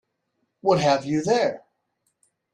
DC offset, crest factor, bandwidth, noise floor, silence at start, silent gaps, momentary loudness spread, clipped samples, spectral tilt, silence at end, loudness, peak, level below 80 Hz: under 0.1%; 18 dB; 10.5 kHz; -75 dBFS; 0.65 s; none; 7 LU; under 0.1%; -5.5 dB/octave; 0.95 s; -22 LUFS; -6 dBFS; -64 dBFS